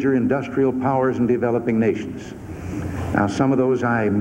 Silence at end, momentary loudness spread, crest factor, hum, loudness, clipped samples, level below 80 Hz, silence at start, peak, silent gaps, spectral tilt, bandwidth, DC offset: 0 s; 12 LU; 18 dB; none; -20 LUFS; under 0.1%; -46 dBFS; 0 s; -2 dBFS; none; -8 dB/octave; 10 kHz; under 0.1%